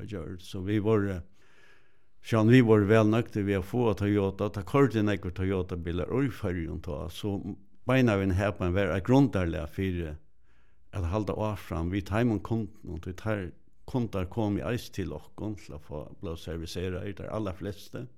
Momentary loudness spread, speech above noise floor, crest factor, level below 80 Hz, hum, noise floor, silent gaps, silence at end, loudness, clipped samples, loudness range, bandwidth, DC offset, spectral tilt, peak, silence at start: 16 LU; 38 dB; 20 dB; -52 dBFS; none; -66 dBFS; none; 0.1 s; -29 LUFS; under 0.1%; 9 LU; 15 kHz; 0.5%; -7.5 dB/octave; -10 dBFS; 0 s